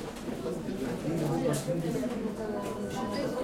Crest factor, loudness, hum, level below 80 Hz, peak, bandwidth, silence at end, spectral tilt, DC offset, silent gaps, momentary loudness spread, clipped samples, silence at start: 16 dB; -33 LUFS; none; -54 dBFS; -16 dBFS; 16.5 kHz; 0 s; -6 dB/octave; under 0.1%; none; 6 LU; under 0.1%; 0 s